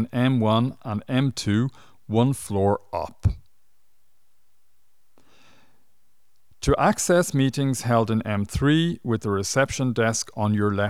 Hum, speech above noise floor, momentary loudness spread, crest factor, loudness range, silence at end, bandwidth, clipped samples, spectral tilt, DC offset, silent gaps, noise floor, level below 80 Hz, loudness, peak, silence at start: none; 49 dB; 7 LU; 18 dB; 10 LU; 0 s; 15.5 kHz; under 0.1%; -5.5 dB/octave; 0.4%; none; -72 dBFS; -42 dBFS; -23 LUFS; -6 dBFS; 0 s